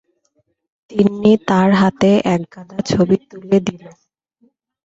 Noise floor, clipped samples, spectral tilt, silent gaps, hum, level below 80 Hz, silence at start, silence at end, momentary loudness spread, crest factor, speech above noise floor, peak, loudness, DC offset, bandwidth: -65 dBFS; under 0.1%; -7 dB/octave; none; none; -50 dBFS; 0.9 s; 1 s; 12 LU; 16 dB; 50 dB; -2 dBFS; -16 LUFS; under 0.1%; 7.8 kHz